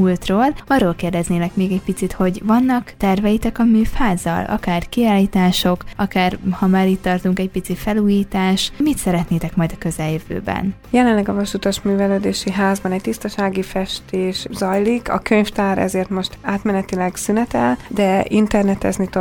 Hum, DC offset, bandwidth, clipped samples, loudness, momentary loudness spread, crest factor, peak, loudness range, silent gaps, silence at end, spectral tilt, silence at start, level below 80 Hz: none; under 0.1%; 19 kHz; under 0.1%; -18 LUFS; 7 LU; 16 dB; 0 dBFS; 2 LU; none; 0 s; -6 dB/octave; 0 s; -36 dBFS